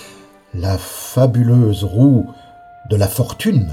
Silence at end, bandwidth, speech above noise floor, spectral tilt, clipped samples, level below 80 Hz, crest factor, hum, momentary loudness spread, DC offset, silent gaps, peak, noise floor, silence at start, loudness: 0 s; 16 kHz; 28 dB; -7 dB/octave; under 0.1%; -40 dBFS; 14 dB; none; 11 LU; under 0.1%; none; -2 dBFS; -42 dBFS; 0 s; -16 LUFS